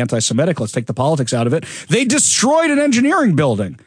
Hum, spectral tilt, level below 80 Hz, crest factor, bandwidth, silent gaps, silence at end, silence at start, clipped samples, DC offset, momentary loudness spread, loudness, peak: none; -4 dB/octave; -58 dBFS; 14 dB; 10.5 kHz; none; 0.1 s; 0 s; under 0.1%; under 0.1%; 7 LU; -15 LUFS; -2 dBFS